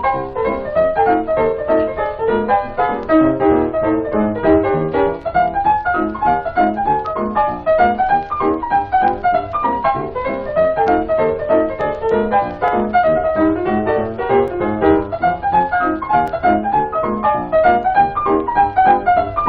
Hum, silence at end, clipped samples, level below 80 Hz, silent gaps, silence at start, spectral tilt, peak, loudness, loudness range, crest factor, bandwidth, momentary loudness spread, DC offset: none; 0 s; under 0.1%; -38 dBFS; none; 0 s; -9 dB/octave; 0 dBFS; -16 LUFS; 1 LU; 14 dB; 5.2 kHz; 5 LU; under 0.1%